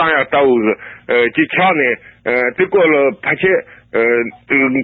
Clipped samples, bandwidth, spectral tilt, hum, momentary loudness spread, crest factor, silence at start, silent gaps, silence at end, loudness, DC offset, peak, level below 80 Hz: under 0.1%; 4.4 kHz; -9.5 dB/octave; none; 6 LU; 14 dB; 0 s; none; 0 s; -14 LUFS; under 0.1%; 0 dBFS; -56 dBFS